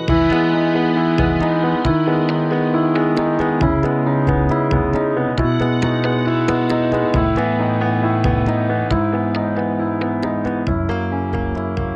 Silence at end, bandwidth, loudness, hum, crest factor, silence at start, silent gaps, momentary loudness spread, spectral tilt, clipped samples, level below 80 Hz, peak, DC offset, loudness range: 0 s; 8 kHz; -18 LUFS; none; 14 dB; 0 s; none; 4 LU; -8 dB/octave; under 0.1%; -30 dBFS; -2 dBFS; under 0.1%; 2 LU